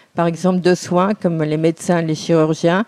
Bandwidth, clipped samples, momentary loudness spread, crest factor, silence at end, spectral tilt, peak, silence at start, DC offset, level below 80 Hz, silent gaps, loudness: 12.5 kHz; under 0.1%; 3 LU; 14 dB; 0.05 s; -6.5 dB/octave; -2 dBFS; 0.15 s; under 0.1%; -58 dBFS; none; -17 LUFS